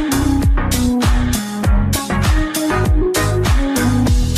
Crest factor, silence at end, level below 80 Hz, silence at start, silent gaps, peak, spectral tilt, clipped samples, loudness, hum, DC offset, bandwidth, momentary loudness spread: 10 dB; 0 s; -18 dBFS; 0 s; none; -4 dBFS; -5.5 dB/octave; under 0.1%; -16 LUFS; none; under 0.1%; 15.5 kHz; 2 LU